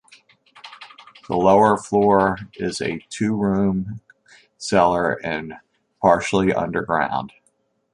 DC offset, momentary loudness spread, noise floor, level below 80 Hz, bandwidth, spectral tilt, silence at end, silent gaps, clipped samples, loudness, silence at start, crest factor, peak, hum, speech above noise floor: under 0.1%; 17 LU; -66 dBFS; -50 dBFS; 11 kHz; -6 dB/octave; 0.65 s; none; under 0.1%; -20 LUFS; 0.65 s; 20 dB; -2 dBFS; none; 47 dB